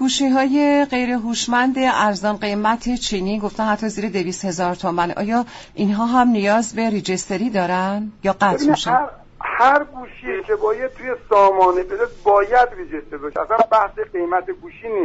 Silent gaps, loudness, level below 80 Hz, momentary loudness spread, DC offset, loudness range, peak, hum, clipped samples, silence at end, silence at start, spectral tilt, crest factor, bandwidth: none; -19 LUFS; -46 dBFS; 11 LU; under 0.1%; 4 LU; -4 dBFS; none; under 0.1%; 0 s; 0 s; -4.5 dB/octave; 14 dB; 8.2 kHz